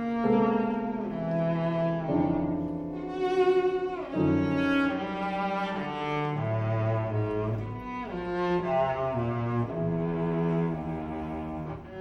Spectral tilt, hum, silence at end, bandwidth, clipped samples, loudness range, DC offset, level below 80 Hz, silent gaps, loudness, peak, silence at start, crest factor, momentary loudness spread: -9 dB/octave; none; 0 s; 8 kHz; under 0.1%; 3 LU; under 0.1%; -52 dBFS; none; -29 LUFS; -14 dBFS; 0 s; 16 dB; 9 LU